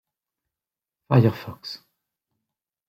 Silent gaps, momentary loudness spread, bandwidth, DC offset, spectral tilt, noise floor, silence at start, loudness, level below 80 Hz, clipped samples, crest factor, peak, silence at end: none; 18 LU; 14.5 kHz; under 0.1%; -8.5 dB/octave; -90 dBFS; 1.1 s; -21 LUFS; -62 dBFS; under 0.1%; 24 dB; -4 dBFS; 1.15 s